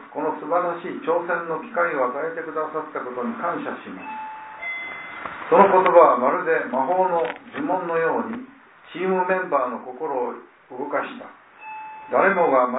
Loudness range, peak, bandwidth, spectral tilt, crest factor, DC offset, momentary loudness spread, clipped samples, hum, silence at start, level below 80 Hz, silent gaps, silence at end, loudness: 8 LU; -2 dBFS; 4 kHz; -10 dB/octave; 22 dB; under 0.1%; 18 LU; under 0.1%; none; 0 s; -72 dBFS; none; 0 s; -22 LUFS